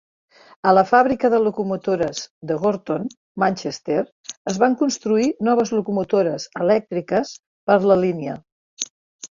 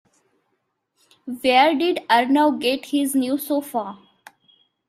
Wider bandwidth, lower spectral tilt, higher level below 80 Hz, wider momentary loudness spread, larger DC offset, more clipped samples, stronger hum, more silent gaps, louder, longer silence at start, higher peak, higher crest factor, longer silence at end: second, 7.6 kHz vs 15.5 kHz; first, -5 dB/octave vs -2.5 dB/octave; first, -60 dBFS vs -68 dBFS; about the same, 14 LU vs 13 LU; neither; neither; neither; first, 2.30-2.41 s, 3.17-3.35 s, 4.12-4.24 s, 4.37-4.45 s, 7.47-7.67 s, 8.52-8.77 s, 8.90-9.19 s vs none; about the same, -20 LUFS vs -20 LUFS; second, 0.65 s vs 1.25 s; about the same, -2 dBFS vs -2 dBFS; about the same, 18 dB vs 20 dB; second, 0.1 s vs 0.95 s